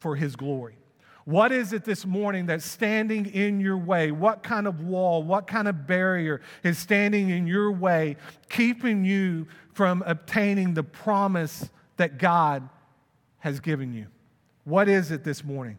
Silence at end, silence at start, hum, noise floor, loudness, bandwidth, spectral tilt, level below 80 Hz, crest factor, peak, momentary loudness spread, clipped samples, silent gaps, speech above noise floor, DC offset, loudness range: 0 s; 0 s; none; -64 dBFS; -25 LUFS; 18 kHz; -6.5 dB/octave; -72 dBFS; 20 dB; -6 dBFS; 11 LU; under 0.1%; none; 40 dB; under 0.1%; 2 LU